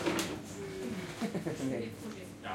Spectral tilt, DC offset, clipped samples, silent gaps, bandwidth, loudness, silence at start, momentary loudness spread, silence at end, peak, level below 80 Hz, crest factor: -4.5 dB/octave; under 0.1%; under 0.1%; none; 16.5 kHz; -38 LUFS; 0 s; 8 LU; 0 s; -18 dBFS; -64 dBFS; 20 dB